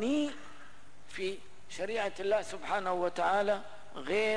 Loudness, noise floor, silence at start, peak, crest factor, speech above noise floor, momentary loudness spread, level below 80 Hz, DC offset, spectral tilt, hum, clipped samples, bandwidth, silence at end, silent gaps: -33 LUFS; -57 dBFS; 0 s; -18 dBFS; 14 dB; 25 dB; 18 LU; -66 dBFS; 0.8%; -4 dB/octave; 50 Hz at -70 dBFS; under 0.1%; 10.5 kHz; 0 s; none